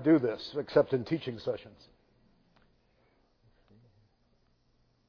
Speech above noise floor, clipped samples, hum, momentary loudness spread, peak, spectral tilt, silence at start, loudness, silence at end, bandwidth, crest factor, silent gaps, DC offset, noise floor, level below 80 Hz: 41 dB; under 0.1%; none; 11 LU; -12 dBFS; -6 dB/octave; 0 s; -31 LUFS; 3.4 s; 5.4 kHz; 22 dB; none; under 0.1%; -70 dBFS; -68 dBFS